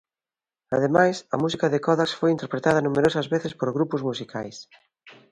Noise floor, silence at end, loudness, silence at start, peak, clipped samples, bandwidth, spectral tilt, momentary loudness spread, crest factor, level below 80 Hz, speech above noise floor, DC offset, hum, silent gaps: under -90 dBFS; 0.2 s; -23 LUFS; 0.7 s; -4 dBFS; under 0.1%; 11 kHz; -6 dB/octave; 11 LU; 20 dB; -62 dBFS; over 67 dB; under 0.1%; none; none